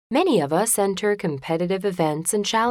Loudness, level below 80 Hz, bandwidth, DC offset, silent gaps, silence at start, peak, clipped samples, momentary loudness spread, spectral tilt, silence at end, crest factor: -22 LUFS; -60 dBFS; 18 kHz; under 0.1%; none; 0.1 s; -8 dBFS; under 0.1%; 5 LU; -4 dB/octave; 0 s; 14 dB